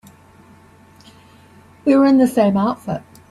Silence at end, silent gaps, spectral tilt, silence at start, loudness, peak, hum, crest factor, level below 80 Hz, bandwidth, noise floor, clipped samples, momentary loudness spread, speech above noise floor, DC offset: 0.3 s; none; -7 dB/octave; 1.85 s; -16 LUFS; -2 dBFS; none; 16 dB; -58 dBFS; 13 kHz; -47 dBFS; under 0.1%; 15 LU; 33 dB; under 0.1%